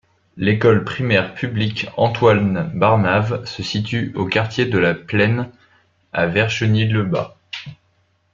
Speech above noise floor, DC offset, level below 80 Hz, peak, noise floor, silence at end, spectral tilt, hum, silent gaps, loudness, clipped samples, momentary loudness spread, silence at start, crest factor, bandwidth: 44 dB; under 0.1%; -52 dBFS; 0 dBFS; -62 dBFS; 0.6 s; -6.5 dB/octave; none; none; -18 LUFS; under 0.1%; 10 LU; 0.35 s; 18 dB; 7.4 kHz